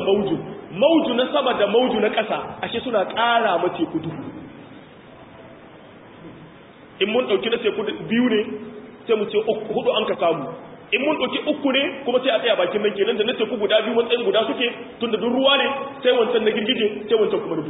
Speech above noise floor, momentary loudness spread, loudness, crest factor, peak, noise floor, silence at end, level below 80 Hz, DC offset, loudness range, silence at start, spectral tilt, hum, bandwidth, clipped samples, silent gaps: 24 dB; 10 LU; -21 LUFS; 16 dB; -4 dBFS; -45 dBFS; 0 s; -60 dBFS; under 0.1%; 6 LU; 0 s; -9.5 dB/octave; none; 4 kHz; under 0.1%; none